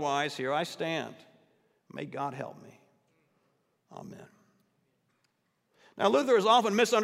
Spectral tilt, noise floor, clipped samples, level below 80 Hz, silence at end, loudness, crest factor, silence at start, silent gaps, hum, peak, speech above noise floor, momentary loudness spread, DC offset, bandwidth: -4 dB/octave; -76 dBFS; under 0.1%; -86 dBFS; 0 s; -28 LUFS; 22 dB; 0 s; none; none; -10 dBFS; 47 dB; 24 LU; under 0.1%; 15.5 kHz